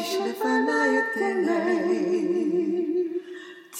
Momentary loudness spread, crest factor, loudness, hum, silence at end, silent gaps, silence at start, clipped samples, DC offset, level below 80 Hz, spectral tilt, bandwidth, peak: 8 LU; 14 dB; -24 LUFS; none; 0 s; none; 0 s; under 0.1%; under 0.1%; -82 dBFS; -4.5 dB/octave; 16.5 kHz; -12 dBFS